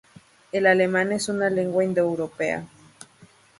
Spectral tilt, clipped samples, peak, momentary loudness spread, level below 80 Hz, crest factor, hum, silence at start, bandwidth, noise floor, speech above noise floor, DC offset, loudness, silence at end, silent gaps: -5 dB/octave; under 0.1%; -6 dBFS; 8 LU; -64 dBFS; 20 dB; none; 0.55 s; 11.5 kHz; -54 dBFS; 32 dB; under 0.1%; -23 LUFS; 0.35 s; none